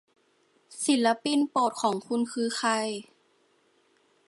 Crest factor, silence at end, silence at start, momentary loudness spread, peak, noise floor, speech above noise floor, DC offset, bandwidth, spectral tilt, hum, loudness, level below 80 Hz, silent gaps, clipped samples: 18 dB; 1.25 s; 0.7 s; 9 LU; -10 dBFS; -67 dBFS; 41 dB; under 0.1%; 11.5 kHz; -3 dB/octave; none; -27 LUFS; -84 dBFS; none; under 0.1%